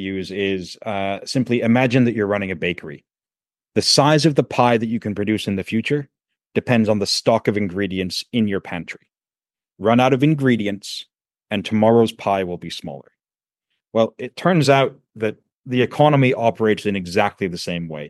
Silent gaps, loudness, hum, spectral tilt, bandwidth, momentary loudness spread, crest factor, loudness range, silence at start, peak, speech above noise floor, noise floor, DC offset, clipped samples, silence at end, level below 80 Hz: 15.54-15.63 s; -19 LUFS; none; -5.5 dB/octave; 12.5 kHz; 12 LU; 18 dB; 3 LU; 0 s; -2 dBFS; over 71 dB; under -90 dBFS; under 0.1%; under 0.1%; 0 s; -60 dBFS